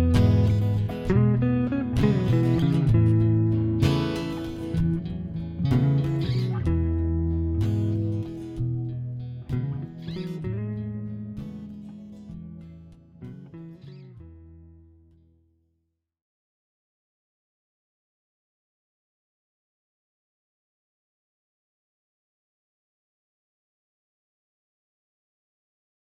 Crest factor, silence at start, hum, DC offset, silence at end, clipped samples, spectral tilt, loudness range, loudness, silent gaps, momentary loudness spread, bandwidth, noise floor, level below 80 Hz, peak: 20 dB; 0 s; none; under 0.1%; 11.45 s; under 0.1%; -8.5 dB/octave; 22 LU; -25 LUFS; none; 21 LU; 10 kHz; -76 dBFS; -40 dBFS; -8 dBFS